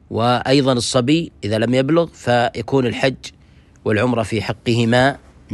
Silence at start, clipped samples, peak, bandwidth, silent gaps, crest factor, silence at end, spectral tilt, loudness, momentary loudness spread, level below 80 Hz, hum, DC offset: 0.1 s; under 0.1%; -2 dBFS; 12 kHz; none; 16 dB; 0 s; -5.5 dB/octave; -18 LUFS; 7 LU; -48 dBFS; none; under 0.1%